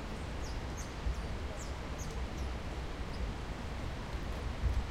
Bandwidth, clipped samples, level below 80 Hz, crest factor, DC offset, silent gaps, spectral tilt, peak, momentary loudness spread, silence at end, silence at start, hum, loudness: 14 kHz; under 0.1%; -40 dBFS; 16 dB; under 0.1%; none; -5.5 dB/octave; -24 dBFS; 4 LU; 0 s; 0 s; none; -41 LUFS